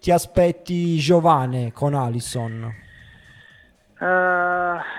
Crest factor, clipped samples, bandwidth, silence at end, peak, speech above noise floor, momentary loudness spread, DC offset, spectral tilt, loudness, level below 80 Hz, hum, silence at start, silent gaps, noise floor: 18 dB; under 0.1%; 15.5 kHz; 0 s; -4 dBFS; 33 dB; 12 LU; under 0.1%; -6 dB/octave; -20 LUFS; -46 dBFS; none; 0.05 s; none; -53 dBFS